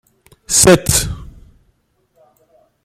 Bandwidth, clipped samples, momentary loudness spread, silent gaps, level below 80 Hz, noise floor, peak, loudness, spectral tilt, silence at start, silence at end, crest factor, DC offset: 16.5 kHz; under 0.1%; 17 LU; none; -36 dBFS; -61 dBFS; 0 dBFS; -12 LUFS; -3.5 dB/octave; 0.5 s; 1.6 s; 18 dB; under 0.1%